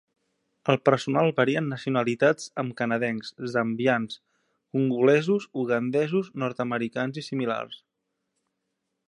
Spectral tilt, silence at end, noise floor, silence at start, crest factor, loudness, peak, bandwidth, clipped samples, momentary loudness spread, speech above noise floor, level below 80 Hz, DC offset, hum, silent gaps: -6.5 dB/octave; 1.35 s; -80 dBFS; 0.65 s; 22 dB; -26 LUFS; -4 dBFS; 11 kHz; under 0.1%; 10 LU; 55 dB; -74 dBFS; under 0.1%; none; none